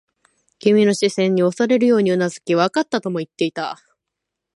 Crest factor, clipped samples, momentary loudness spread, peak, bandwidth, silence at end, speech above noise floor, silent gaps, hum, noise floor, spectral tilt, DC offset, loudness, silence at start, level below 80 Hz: 16 dB; under 0.1%; 10 LU; -2 dBFS; 11.5 kHz; 0.8 s; 64 dB; none; none; -81 dBFS; -5.5 dB/octave; under 0.1%; -18 LUFS; 0.65 s; -68 dBFS